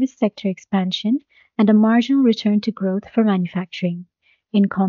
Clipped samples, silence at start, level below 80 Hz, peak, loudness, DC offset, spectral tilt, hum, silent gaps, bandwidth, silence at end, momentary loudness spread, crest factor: under 0.1%; 0 s; -66 dBFS; -6 dBFS; -19 LUFS; under 0.1%; -6 dB/octave; none; none; 7 kHz; 0 s; 10 LU; 14 dB